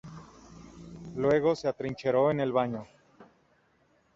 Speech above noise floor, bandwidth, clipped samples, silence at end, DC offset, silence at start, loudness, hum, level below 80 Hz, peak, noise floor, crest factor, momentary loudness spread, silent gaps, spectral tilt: 40 dB; 7.8 kHz; under 0.1%; 0.9 s; under 0.1%; 0.05 s; -28 LUFS; none; -62 dBFS; -12 dBFS; -68 dBFS; 18 dB; 23 LU; none; -7 dB/octave